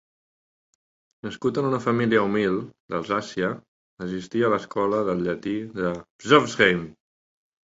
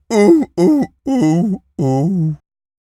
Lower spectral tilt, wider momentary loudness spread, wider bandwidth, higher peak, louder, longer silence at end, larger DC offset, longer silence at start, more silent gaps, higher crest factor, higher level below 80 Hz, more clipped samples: second, -5.5 dB/octave vs -8 dB/octave; first, 14 LU vs 9 LU; second, 8 kHz vs 13 kHz; about the same, -2 dBFS vs 0 dBFS; second, -24 LUFS vs -15 LUFS; first, 0.85 s vs 0.55 s; neither; first, 1.25 s vs 0.1 s; first, 2.80-2.88 s, 3.68-3.97 s, 6.10-6.19 s vs none; first, 24 dB vs 14 dB; second, -58 dBFS vs -50 dBFS; neither